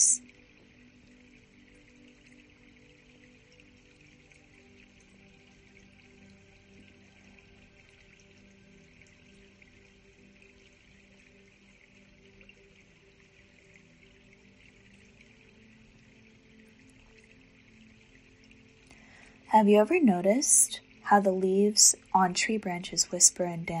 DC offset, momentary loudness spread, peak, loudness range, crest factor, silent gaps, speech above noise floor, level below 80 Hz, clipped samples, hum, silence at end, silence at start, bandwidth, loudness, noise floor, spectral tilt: under 0.1%; 10 LU; -4 dBFS; 7 LU; 28 dB; none; 35 dB; -66 dBFS; under 0.1%; none; 0 s; 0 s; 13.5 kHz; -24 LUFS; -60 dBFS; -2.5 dB/octave